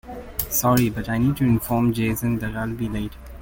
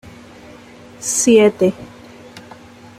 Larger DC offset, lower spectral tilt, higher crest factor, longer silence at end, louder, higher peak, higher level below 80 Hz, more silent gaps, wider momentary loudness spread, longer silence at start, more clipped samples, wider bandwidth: neither; first, -6 dB/octave vs -4 dB/octave; about the same, 18 dB vs 18 dB; second, 0 s vs 0.6 s; second, -22 LUFS vs -14 LUFS; about the same, -4 dBFS vs -2 dBFS; first, -40 dBFS vs -56 dBFS; neither; second, 9 LU vs 27 LU; second, 0.05 s vs 1 s; neither; about the same, 17 kHz vs 15.5 kHz